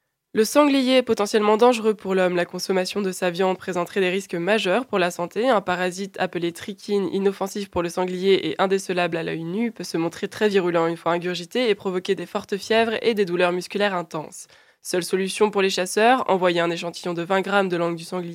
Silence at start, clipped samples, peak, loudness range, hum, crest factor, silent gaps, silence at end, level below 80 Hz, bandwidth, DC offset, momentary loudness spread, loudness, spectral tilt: 0.35 s; under 0.1%; -2 dBFS; 3 LU; none; 20 dB; none; 0 s; -66 dBFS; 16 kHz; under 0.1%; 9 LU; -22 LUFS; -4.5 dB/octave